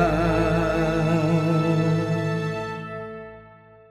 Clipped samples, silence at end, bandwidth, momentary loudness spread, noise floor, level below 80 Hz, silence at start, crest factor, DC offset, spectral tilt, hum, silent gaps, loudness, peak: under 0.1%; 0.4 s; 11 kHz; 14 LU; -48 dBFS; -38 dBFS; 0 s; 14 dB; under 0.1%; -7.5 dB/octave; none; none; -23 LUFS; -8 dBFS